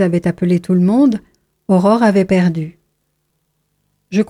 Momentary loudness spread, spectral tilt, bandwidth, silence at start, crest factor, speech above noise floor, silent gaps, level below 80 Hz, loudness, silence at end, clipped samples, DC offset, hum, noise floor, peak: 13 LU; -8 dB/octave; 11.5 kHz; 0 s; 14 dB; 54 dB; none; -52 dBFS; -14 LUFS; 0.05 s; under 0.1%; under 0.1%; none; -67 dBFS; -2 dBFS